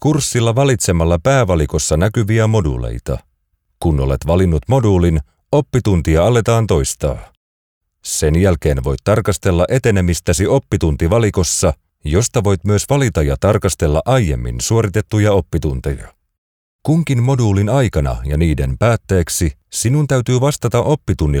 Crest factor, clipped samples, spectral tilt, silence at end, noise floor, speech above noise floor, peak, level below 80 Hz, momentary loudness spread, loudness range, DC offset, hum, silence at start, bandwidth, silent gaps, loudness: 12 dB; under 0.1%; -6 dB/octave; 0 s; -66 dBFS; 51 dB; -2 dBFS; -26 dBFS; 6 LU; 2 LU; under 0.1%; none; 0 s; 17.5 kHz; 7.37-7.81 s, 16.38-16.79 s; -15 LUFS